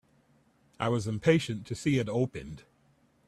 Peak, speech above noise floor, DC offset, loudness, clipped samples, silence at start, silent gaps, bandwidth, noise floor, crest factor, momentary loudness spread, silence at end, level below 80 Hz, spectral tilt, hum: -10 dBFS; 38 dB; under 0.1%; -30 LUFS; under 0.1%; 0.8 s; none; 13 kHz; -67 dBFS; 20 dB; 17 LU; 0.7 s; -60 dBFS; -6.5 dB/octave; none